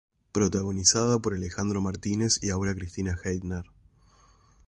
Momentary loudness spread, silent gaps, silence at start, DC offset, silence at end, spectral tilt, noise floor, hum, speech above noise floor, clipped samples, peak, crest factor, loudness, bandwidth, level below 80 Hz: 11 LU; none; 0.35 s; under 0.1%; 1.05 s; -4 dB/octave; -59 dBFS; none; 32 dB; under 0.1%; -4 dBFS; 24 dB; -27 LUFS; 11.5 kHz; -44 dBFS